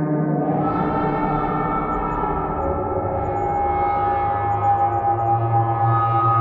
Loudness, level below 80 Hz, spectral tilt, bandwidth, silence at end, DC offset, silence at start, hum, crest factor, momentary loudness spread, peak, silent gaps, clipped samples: -21 LUFS; -38 dBFS; -10.5 dB/octave; 4.5 kHz; 0 s; under 0.1%; 0 s; none; 12 dB; 4 LU; -8 dBFS; none; under 0.1%